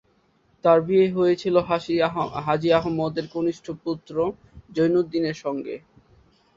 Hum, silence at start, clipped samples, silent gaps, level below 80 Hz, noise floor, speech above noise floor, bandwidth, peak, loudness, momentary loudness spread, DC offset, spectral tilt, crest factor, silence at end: none; 0.65 s; under 0.1%; none; -56 dBFS; -63 dBFS; 41 dB; 7.6 kHz; -4 dBFS; -23 LUFS; 11 LU; under 0.1%; -7 dB/octave; 20 dB; 0.8 s